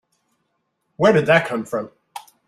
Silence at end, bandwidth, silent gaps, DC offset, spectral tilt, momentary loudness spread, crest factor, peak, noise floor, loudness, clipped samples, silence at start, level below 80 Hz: 0.25 s; 14 kHz; none; under 0.1%; -6 dB/octave; 23 LU; 20 dB; -2 dBFS; -72 dBFS; -18 LUFS; under 0.1%; 1 s; -60 dBFS